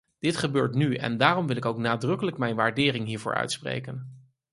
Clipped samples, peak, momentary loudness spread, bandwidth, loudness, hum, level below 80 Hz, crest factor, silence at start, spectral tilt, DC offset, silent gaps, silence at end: under 0.1%; -4 dBFS; 10 LU; 11.5 kHz; -26 LUFS; none; -62 dBFS; 24 dB; 0.25 s; -5.5 dB/octave; under 0.1%; none; 0.35 s